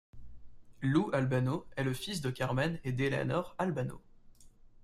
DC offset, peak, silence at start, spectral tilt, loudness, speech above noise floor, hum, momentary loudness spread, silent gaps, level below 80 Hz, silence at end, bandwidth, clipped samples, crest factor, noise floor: under 0.1%; -16 dBFS; 0.15 s; -6.5 dB/octave; -34 LUFS; 24 dB; none; 6 LU; none; -58 dBFS; 0.35 s; 14 kHz; under 0.1%; 18 dB; -56 dBFS